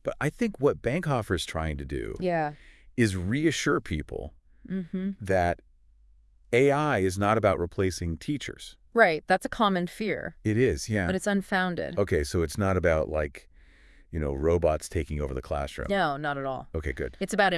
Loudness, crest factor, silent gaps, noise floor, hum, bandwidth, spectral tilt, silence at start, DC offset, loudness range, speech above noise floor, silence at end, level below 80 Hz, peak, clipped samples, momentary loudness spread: -28 LUFS; 20 dB; none; -58 dBFS; none; 12 kHz; -5.5 dB/octave; 0.05 s; under 0.1%; 4 LU; 31 dB; 0 s; -44 dBFS; -6 dBFS; under 0.1%; 10 LU